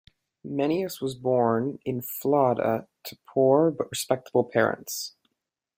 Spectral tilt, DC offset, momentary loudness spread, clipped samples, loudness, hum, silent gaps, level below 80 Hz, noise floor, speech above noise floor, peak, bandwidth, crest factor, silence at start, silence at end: -5.5 dB/octave; under 0.1%; 12 LU; under 0.1%; -26 LUFS; none; none; -68 dBFS; -83 dBFS; 58 dB; -6 dBFS; 16.5 kHz; 20 dB; 0.45 s; 0.7 s